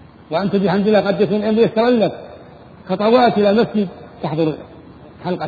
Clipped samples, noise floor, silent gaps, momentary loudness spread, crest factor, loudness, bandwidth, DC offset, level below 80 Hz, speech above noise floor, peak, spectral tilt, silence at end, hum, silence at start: under 0.1%; -40 dBFS; none; 14 LU; 16 dB; -17 LUFS; 4.9 kHz; under 0.1%; -52 dBFS; 25 dB; 0 dBFS; -9 dB/octave; 0 s; none; 0.3 s